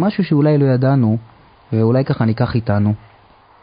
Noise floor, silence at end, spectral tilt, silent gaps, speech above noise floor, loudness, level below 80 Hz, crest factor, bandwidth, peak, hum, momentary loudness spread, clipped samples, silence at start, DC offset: -48 dBFS; 0.65 s; -13.5 dB/octave; none; 33 dB; -16 LUFS; -44 dBFS; 14 dB; 5.2 kHz; -2 dBFS; none; 7 LU; under 0.1%; 0 s; under 0.1%